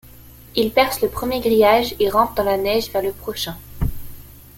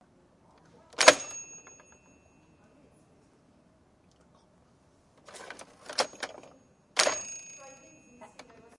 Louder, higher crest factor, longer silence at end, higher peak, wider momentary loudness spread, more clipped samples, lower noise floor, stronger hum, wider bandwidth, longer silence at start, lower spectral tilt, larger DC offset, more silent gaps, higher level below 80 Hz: first, -19 LUFS vs -27 LUFS; second, 18 dB vs 34 dB; second, 0.3 s vs 0.55 s; about the same, -2 dBFS vs 0 dBFS; second, 12 LU vs 30 LU; neither; second, -43 dBFS vs -64 dBFS; neither; first, 17 kHz vs 11.5 kHz; second, 0.2 s vs 1 s; first, -4.5 dB/octave vs 0 dB/octave; neither; neither; first, -36 dBFS vs -74 dBFS